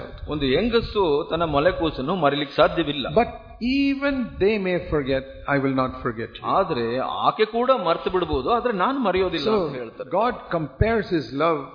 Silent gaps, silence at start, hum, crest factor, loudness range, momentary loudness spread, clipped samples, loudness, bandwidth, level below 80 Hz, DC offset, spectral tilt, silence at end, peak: none; 0 s; none; 18 dB; 2 LU; 7 LU; under 0.1%; -23 LUFS; 5.2 kHz; -40 dBFS; under 0.1%; -8 dB/octave; 0 s; -4 dBFS